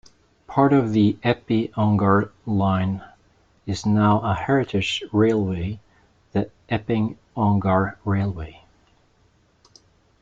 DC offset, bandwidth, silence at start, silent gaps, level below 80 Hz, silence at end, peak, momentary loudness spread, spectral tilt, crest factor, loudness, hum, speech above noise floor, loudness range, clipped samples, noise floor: under 0.1%; 7.8 kHz; 0.5 s; none; -50 dBFS; 1.7 s; -4 dBFS; 10 LU; -7.5 dB/octave; 20 dB; -22 LUFS; none; 40 dB; 4 LU; under 0.1%; -60 dBFS